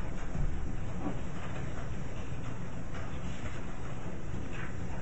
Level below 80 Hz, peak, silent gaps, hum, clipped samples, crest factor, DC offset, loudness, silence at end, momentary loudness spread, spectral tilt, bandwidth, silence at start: -40 dBFS; -20 dBFS; none; none; under 0.1%; 16 dB; 2%; -40 LUFS; 0 s; 4 LU; -6.5 dB/octave; 8 kHz; 0 s